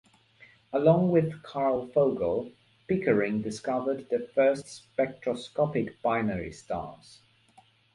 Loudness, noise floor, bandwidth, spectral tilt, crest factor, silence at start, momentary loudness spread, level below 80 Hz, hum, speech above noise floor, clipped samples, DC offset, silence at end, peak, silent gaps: -28 LUFS; -61 dBFS; 11.5 kHz; -7 dB/octave; 20 dB; 0.7 s; 12 LU; -60 dBFS; none; 33 dB; under 0.1%; under 0.1%; 1 s; -8 dBFS; none